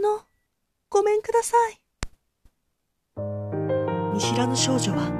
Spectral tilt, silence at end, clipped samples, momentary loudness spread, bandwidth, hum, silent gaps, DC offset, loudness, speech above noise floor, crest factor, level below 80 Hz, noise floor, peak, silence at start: -4.5 dB/octave; 0 s; under 0.1%; 17 LU; 14 kHz; none; none; under 0.1%; -24 LUFS; 53 dB; 20 dB; -50 dBFS; -76 dBFS; -6 dBFS; 0 s